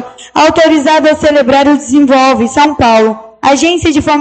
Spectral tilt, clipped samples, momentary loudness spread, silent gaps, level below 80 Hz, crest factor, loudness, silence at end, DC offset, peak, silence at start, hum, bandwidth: -4 dB/octave; under 0.1%; 4 LU; none; -36 dBFS; 8 dB; -8 LUFS; 0 s; under 0.1%; 0 dBFS; 0 s; none; 9 kHz